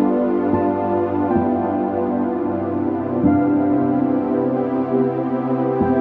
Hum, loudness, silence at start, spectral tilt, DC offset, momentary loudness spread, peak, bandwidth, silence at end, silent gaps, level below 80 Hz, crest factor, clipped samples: none; -19 LUFS; 0 s; -11.5 dB/octave; under 0.1%; 4 LU; -4 dBFS; 4.1 kHz; 0 s; none; -50 dBFS; 14 dB; under 0.1%